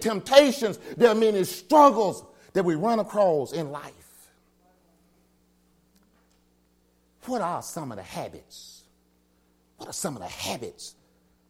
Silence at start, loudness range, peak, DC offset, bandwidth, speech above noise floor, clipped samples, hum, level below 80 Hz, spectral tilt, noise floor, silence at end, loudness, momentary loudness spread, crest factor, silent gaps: 0 s; 15 LU; -4 dBFS; under 0.1%; 16.5 kHz; 42 dB; under 0.1%; none; -66 dBFS; -4.5 dB/octave; -65 dBFS; 0.6 s; -24 LUFS; 25 LU; 22 dB; none